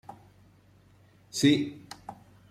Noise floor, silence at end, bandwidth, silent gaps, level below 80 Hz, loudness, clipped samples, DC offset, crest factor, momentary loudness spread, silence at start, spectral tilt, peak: -59 dBFS; 0.4 s; 14.5 kHz; none; -66 dBFS; -27 LUFS; under 0.1%; under 0.1%; 22 dB; 23 LU; 0.1 s; -4.5 dB/octave; -10 dBFS